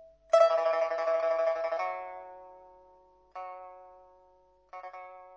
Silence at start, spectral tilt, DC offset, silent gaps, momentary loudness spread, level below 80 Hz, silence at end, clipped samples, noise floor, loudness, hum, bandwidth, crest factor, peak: 0 s; -1.5 dB/octave; under 0.1%; none; 24 LU; -74 dBFS; 0 s; under 0.1%; -64 dBFS; -28 LUFS; none; 8 kHz; 22 dB; -10 dBFS